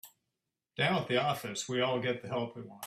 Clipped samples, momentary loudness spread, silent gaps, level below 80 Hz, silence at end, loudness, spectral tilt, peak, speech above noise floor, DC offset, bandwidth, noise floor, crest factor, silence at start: under 0.1%; 7 LU; none; -74 dBFS; 0 s; -33 LUFS; -4.5 dB/octave; -16 dBFS; 54 dB; under 0.1%; 15.5 kHz; -87 dBFS; 18 dB; 0.05 s